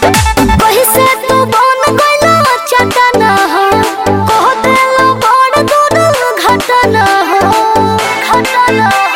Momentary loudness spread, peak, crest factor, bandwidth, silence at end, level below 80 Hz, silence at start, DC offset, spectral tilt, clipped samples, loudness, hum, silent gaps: 3 LU; 0 dBFS; 8 dB; 17.5 kHz; 0 s; -28 dBFS; 0 s; under 0.1%; -4 dB/octave; under 0.1%; -8 LUFS; none; none